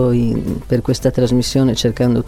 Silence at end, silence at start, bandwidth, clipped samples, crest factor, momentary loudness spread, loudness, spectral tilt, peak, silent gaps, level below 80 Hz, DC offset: 0 s; 0 s; 15 kHz; under 0.1%; 12 dB; 4 LU; -16 LUFS; -6.5 dB/octave; -2 dBFS; none; -34 dBFS; under 0.1%